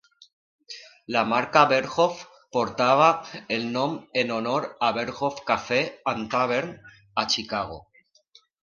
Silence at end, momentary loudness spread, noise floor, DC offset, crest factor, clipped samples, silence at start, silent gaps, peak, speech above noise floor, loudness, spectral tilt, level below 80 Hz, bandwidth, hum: 0.8 s; 15 LU; -59 dBFS; under 0.1%; 22 dB; under 0.1%; 0.7 s; none; -4 dBFS; 35 dB; -24 LUFS; -4 dB/octave; -62 dBFS; 7.2 kHz; none